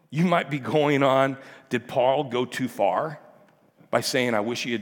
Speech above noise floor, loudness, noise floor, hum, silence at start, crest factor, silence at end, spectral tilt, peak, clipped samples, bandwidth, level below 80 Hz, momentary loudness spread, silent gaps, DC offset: 34 dB; -24 LUFS; -57 dBFS; none; 0.1 s; 20 dB; 0 s; -5 dB/octave; -4 dBFS; under 0.1%; 18 kHz; -78 dBFS; 10 LU; none; under 0.1%